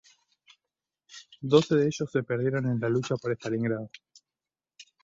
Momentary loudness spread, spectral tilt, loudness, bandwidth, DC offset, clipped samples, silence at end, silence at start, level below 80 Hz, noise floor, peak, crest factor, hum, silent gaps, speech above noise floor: 21 LU; -6.5 dB/octave; -27 LUFS; 7.8 kHz; under 0.1%; under 0.1%; 0.2 s; 1.1 s; -68 dBFS; under -90 dBFS; -6 dBFS; 22 dB; none; none; over 64 dB